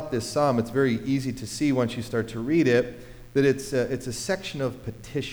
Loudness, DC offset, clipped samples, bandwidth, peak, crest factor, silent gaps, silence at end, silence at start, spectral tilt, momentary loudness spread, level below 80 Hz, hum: -26 LUFS; under 0.1%; under 0.1%; over 20 kHz; -10 dBFS; 16 dB; none; 0 s; 0 s; -5.5 dB/octave; 9 LU; -50 dBFS; none